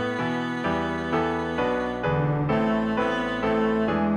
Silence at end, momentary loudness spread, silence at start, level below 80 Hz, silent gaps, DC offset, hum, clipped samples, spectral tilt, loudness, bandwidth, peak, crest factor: 0 s; 3 LU; 0 s; -48 dBFS; none; under 0.1%; none; under 0.1%; -7.5 dB/octave; -25 LUFS; 9.6 kHz; -12 dBFS; 12 dB